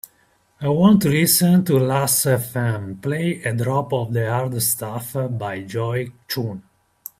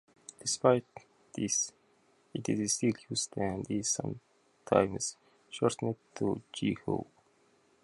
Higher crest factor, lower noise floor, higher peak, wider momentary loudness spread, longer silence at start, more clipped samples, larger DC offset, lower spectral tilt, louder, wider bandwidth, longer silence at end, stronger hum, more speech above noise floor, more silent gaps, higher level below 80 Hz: second, 18 dB vs 24 dB; second, -60 dBFS vs -68 dBFS; first, -2 dBFS vs -10 dBFS; about the same, 12 LU vs 13 LU; first, 0.6 s vs 0.4 s; neither; neither; about the same, -5 dB/octave vs -4 dB/octave; first, -20 LUFS vs -32 LUFS; first, 16 kHz vs 11.5 kHz; second, 0.6 s vs 0.8 s; neither; first, 41 dB vs 36 dB; neither; first, -56 dBFS vs -64 dBFS